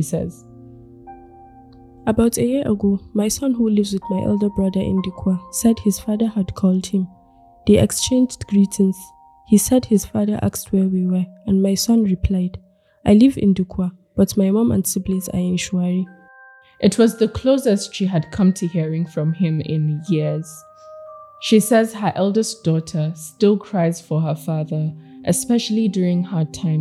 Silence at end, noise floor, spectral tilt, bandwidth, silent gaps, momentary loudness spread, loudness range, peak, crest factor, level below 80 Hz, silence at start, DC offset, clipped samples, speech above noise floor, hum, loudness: 0 s; -47 dBFS; -6 dB/octave; 14.5 kHz; none; 9 LU; 3 LU; -2 dBFS; 16 dB; -42 dBFS; 0 s; under 0.1%; under 0.1%; 29 dB; none; -19 LUFS